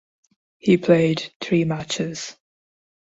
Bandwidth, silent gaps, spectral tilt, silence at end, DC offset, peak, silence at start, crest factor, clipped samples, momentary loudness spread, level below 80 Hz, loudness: 8 kHz; 1.36-1.40 s; -6 dB/octave; 0.85 s; under 0.1%; -4 dBFS; 0.65 s; 20 dB; under 0.1%; 12 LU; -60 dBFS; -21 LUFS